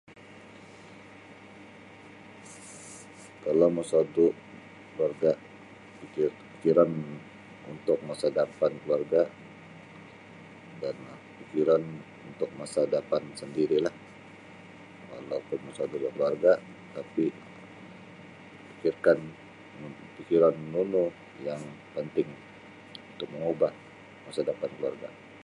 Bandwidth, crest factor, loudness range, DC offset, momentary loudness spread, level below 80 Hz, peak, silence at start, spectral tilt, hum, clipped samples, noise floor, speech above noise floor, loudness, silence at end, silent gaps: 11.5 kHz; 22 dB; 5 LU; under 0.1%; 24 LU; -72 dBFS; -8 dBFS; 0.1 s; -6.5 dB/octave; none; under 0.1%; -50 dBFS; 22 dB; -29 LUFS; 0.05 s; none